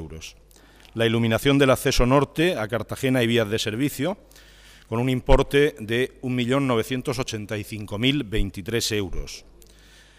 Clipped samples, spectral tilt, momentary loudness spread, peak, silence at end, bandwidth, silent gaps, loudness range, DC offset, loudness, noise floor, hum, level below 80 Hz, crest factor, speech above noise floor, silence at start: under 0.1%; -5 dB/octave; 13 LU; -2 dBFS; 0.8 s; 15.5 kHz; none; 4 LU; under 0.1%; -23 LUFS; -51 dBFS; none; -34 dBFS; 20 dB; 28 dB; 0 s